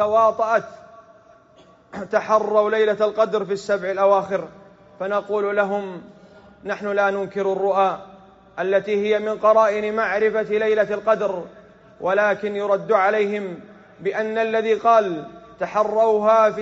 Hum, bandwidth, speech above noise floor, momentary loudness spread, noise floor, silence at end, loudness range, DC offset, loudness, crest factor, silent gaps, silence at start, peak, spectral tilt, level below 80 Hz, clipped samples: none; 7.8 kHz; 32 dB; 14 LU; -52 dBFS; 0 s; 4 LU; under 0.1%; -20 LUFS; 16 dB; none; 0 s; -4 dBFS; -3.5 dB/octave; -64 dBFS; under 0.1%